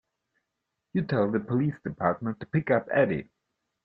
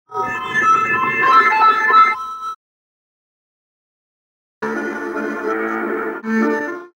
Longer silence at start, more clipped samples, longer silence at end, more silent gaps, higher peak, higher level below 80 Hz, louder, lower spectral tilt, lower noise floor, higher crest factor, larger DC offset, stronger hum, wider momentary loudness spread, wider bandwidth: first, 0.95 s vs 0.1 s; neither; first, 0.6 s vs 0.1 s; second, none vs 2.56-4.61 s; second, -8 dBFS vs -2 dBFS; about the same, -62 dBFS vs -60 dBFS; second, -28 LUFS vs -16 LUFS; first, -10.5 dB/octave vs -4.5 dB/octave; second, -83 dBFS vs under -90 dBFS; about the same, 20 dB vs 18 dB; neither; neither; second, 7 LU vs 14 LU; second, 5.4 kHz vs 16 kHz